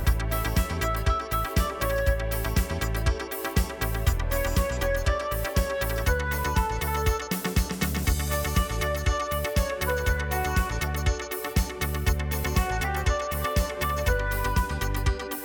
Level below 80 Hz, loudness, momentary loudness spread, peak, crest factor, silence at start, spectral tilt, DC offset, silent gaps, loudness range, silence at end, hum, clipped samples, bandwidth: -28 dBFS; -27 LUFS; 2 LU; -10 dBFS; 16 dB; 0 s; -4.5 dB/octave; under 0.1%; none; 1 LU; 0 s; none; under 0.1%; over 20 kHz